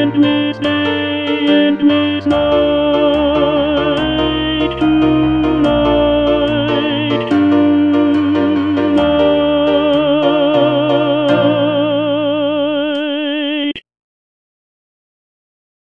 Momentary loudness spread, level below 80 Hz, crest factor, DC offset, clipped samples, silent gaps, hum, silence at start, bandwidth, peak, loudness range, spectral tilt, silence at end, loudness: 4 LU; -36 dBFS; 12 dB; 0.4%; under 0.1%; none; none; 0 s; 5.6 kHz; 0 dBFS; 4 LU; -7.5 dB/octave; 2.1 s; -13 LUFS